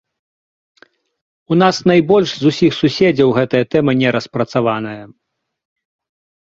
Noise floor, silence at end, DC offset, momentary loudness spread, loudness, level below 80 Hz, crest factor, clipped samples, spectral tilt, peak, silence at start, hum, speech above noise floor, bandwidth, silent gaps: under -90 dBFS; 1.4 s; under 0.1%; 7 LU; -14 LUFS; -52 dBFS; 16 dB; under 0.1%; -6.5 dB/octave; 0 dBFS; 1.5 s; none; over 76 dB; 7.8 kHz; none